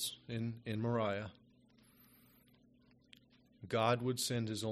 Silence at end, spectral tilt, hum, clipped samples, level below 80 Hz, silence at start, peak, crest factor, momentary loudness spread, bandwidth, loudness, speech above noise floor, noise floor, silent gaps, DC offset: 0 s; -5 dB/octave; none; under 0.1%; -74 dBFS; 0 s; -18 dBFS; 22 dB; 9 LU; 14 kHz; -38 LUFS; 31 dB; -68 dBFS; none; under 0.1%